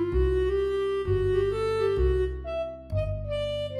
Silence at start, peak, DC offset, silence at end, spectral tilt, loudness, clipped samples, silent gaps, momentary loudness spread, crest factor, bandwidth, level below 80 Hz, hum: 0 s; -14 dBFS; under 0.1%; 0 s; -8 dB/octave; -27 LUFS; under 0.1%; none; 7 LU; 12 dB; 11 kHz; -34 dBFS; none